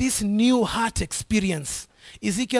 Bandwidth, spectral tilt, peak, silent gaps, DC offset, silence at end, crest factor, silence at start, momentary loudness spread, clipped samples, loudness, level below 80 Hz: 12 kHz; -4 dB/octave; -8 dBFS; none; under 0.1%; 0 s; 16 dB; 0 s; 11 LU; under 0.1%; -24 LUFS; -42 dBFS